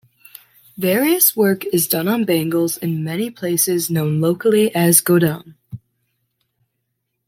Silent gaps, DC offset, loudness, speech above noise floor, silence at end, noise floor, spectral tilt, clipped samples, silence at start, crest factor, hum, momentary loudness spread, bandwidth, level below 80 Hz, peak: none; under 0.1%; -17 LUFS; 57 dB; 1.5 s; -74 dBFS; -4.5 dB/octave; under 0.1%; 0.8 s; 18 dB; none; 11 LU; 16.5 kHz; -62 dBFS; 0 dBFS